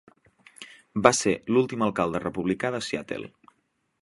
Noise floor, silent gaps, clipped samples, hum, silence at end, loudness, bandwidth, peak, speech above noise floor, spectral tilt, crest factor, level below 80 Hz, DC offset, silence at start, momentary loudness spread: -72 dBFS; none; under 0.1%; none; 0.75 s; -26 LUFS; 11.5 kHz; 0 dBFS; 47 dB; -4.5 dB/octave; 26 dB; -58 dBFS; under 0.1%; 0.6 s; 24 LU